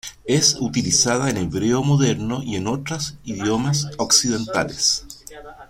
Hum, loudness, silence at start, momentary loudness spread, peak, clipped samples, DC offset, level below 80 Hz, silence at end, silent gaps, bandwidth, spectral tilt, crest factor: none; -20 LUFS; 0.05 s; 10 LU; -2 dBFS; under 0.1%; under 0.1%; -48 dBFS; 0.05 s; none; 16 kHz; -3.5 dB/octave; 18 dB